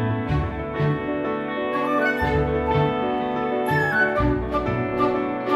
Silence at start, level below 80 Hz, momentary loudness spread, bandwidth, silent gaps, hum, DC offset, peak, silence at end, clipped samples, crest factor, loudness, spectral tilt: 0 s; -36 dBFS; 5 LU; 13 kHz; none; none; under 0.1%; -8 dBFS; 0 s; under 0.1%; 14 dB; -23 LUFS; -8 dB/octave